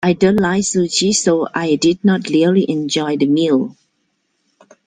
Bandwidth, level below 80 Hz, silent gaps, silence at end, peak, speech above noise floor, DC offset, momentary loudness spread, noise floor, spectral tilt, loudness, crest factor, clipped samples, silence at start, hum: 9.8 kHz; -54 dBFS; none; 1.15 s; 0 dBFS; 52 dB; under 0.1%; 4 LU; -67 dBFS; -4.5 dB/octave; -15 LUFS; 16 dB; under 0.1%; 0 s; none